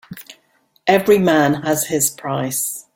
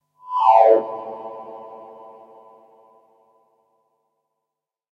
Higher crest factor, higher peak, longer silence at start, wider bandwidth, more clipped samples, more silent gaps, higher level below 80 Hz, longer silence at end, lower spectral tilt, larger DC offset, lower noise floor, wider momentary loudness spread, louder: second, 16 dB vs 22 dB; about the same, -2 dBFS vs 0 dBFS; second, 0.1 s vs 0.3 s; first, 17 kHz vs 6.4 kHz; neither; neither; first, -56 dBFS vs -86 dBFS; second, 0.15 s vs 3.2 s; second, -4 dB/octave vs -5.5 dB/octave; neither; second, -60 dBFS vs -84 dBFS; second, 10 LU vs 27 LU; about the same, -17 LUFS vs -17 LUFS